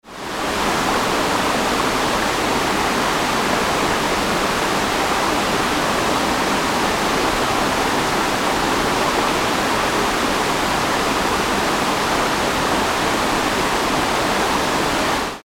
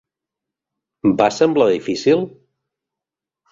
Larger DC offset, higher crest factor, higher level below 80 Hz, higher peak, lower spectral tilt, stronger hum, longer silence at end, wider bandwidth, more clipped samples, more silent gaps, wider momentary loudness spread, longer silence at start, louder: neither; about the same, 14 dB vs 18 dB; first, -38 dBFS vs -58 dBFS; second, -6 dBFS vs -2 dBFS; second, -3 dB/octave vs -5.5 dB/octave; neither; second, 0.05 s vs 1.25 s; first, 19 kHz vs 7.8 kHz; neither; neither; second, 1 LU vs 5 LU; second, 0.05 s vs 1.05 s; about the same, -18 LUFS vs -17 LUFS